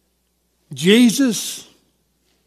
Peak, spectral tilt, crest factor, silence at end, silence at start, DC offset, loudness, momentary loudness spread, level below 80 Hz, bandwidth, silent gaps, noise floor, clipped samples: 0 dBFS; -4 dB/octave; 18 dB; 0.85 s; 0.7 s; under 0.1%; -16 LUFS; 20 LU; -70 dBFS; 15 kHz; none; -66 dBFS; under 0.1%